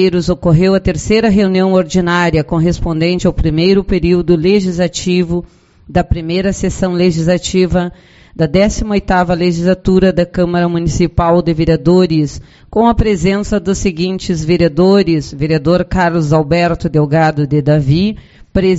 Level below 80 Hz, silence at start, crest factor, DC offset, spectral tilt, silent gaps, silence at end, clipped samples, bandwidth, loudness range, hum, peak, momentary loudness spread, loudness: -28 dBFS; 0 s; 12 dB; under 0.1%; -6.5 dB/octave; none; 0 s; under 0.1%; 8 kHz; 2 LU; none; 0 dBFS; 6 LU; -13 LUFS